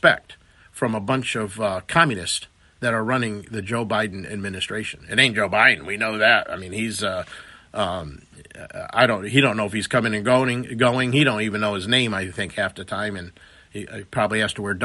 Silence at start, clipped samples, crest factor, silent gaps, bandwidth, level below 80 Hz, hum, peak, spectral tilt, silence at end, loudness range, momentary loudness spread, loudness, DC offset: 0.05 s; under 0.1%; 22 dB; none; 11.5 kHz; -56 dBFS; none; 0 dBFS; -4.5 dB/octave; 0 s; 4 LU; 14 LU; -21 LUFS; under 0.1%